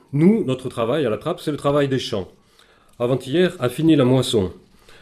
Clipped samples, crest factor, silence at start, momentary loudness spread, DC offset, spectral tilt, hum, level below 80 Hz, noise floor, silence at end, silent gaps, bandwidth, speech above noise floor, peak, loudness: under 0.1%; 16 dB; 0.1 s; 10 LU; under 0.1%; -6.5 dB/octave; none; -54 dBFS; -54 dBFS; 0.45 s; none; 14.5 kHz; 35 dB; -4 dBFS; -20 LUFS